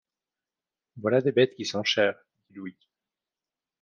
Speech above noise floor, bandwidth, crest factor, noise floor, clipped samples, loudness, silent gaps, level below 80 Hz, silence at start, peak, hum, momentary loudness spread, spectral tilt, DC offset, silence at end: over 64 dB; 7.2 kHz; 20 dB; under -90 dBFS; under 0.1%; -25 LUFS; none; -76 dBFS; 0.95 s; -8 dBFS; none; 19 LU; -4.5 dB/octave; under 0.1%; 1.1 s